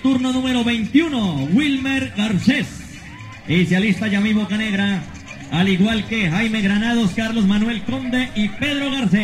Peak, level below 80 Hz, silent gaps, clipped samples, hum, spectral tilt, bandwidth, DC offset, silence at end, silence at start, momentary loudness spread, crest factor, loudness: -4 dBFS; -42 dBFS; none; under 0.1%; none; -5.5 dB/octave; 12 kHz; under 0.1%; 0 s; 0 s; 8 LU; 16 dB; -19 LUFS